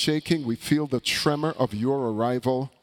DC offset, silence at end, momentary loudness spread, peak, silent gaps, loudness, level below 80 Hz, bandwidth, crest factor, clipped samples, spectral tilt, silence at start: under 0.1%; 0.15 s; 3 LU; -8 dBFS; none; -25 LUFS; -58 dBFS; 18 kHz; 16 dB; under 0.1%; -5 dB/octave; 0 s